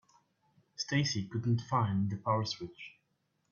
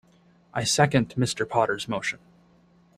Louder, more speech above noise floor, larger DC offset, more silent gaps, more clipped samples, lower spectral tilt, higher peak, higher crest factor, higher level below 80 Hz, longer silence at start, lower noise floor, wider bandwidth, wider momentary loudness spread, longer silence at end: second, -33 LUFS vs -25 LUFS; first, 46 dB vs 34 dB; neither; neither; neither; first, -5.5 dB/octave vs -4 dB/octave; second, -16 dBFS vs -6 dBFS; about the same, 18 dB vs 20 dB; second, -68 dBFS vs -58 dBFS; first, 0.8 s vs 0.55 s; first, -78 dBFS vs -59 dBFS; second, 7.2 kHz vs 15 kHz; first, 17 LU vs 11 LU; second, 0.6 s vs 0.8 s